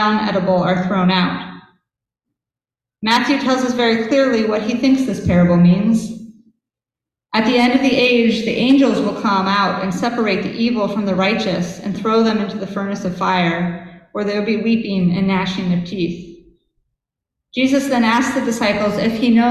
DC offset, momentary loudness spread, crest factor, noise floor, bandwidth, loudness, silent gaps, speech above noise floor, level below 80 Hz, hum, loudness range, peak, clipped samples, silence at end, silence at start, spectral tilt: under 0.1%; 10 LU; 16 dB; -89 dBFS; 12.5 kHz; -16 LUFS; none; 73 dB; -46 dBFS; none; 4 LU; -2 dBFS; under 0.1%; 0 s; 0 s; -6 dB/octave